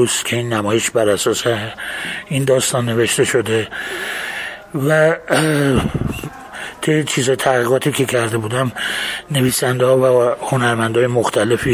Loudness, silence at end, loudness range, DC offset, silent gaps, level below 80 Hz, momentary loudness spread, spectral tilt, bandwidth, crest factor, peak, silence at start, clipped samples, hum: -17 LUFS; 0 s; 2 LU; under 0.1%; none; -42 dBFS; 9 LU; -4.5 dB/octave; 16 kHz; 16 dB; -2 dBFS; 0 s; under 0.1%; none